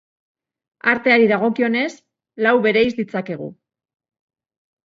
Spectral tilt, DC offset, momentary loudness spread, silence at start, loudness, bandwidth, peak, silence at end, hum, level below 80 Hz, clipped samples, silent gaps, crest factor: -6 dB/octave; under 0.1%; 13 LU; 0.85 s; -18 LUFS; 7.6 kHz; -2 dBFS; 1.3 s; none; -62 dBFS; under 0.1%; none; 20 dB